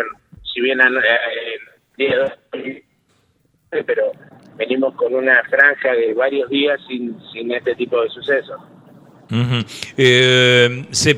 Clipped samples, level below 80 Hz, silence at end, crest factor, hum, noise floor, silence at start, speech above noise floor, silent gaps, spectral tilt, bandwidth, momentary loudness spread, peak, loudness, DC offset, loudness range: under 0.1%; -58 dBFS; 0 s; 18 dB; none; -61 dBFS; 0 s; 44 dB; none; -4 dB/octave; 13 kHz; 17 LU; 0 dBFS; -16 LUFS; under 0.1%; 7 LU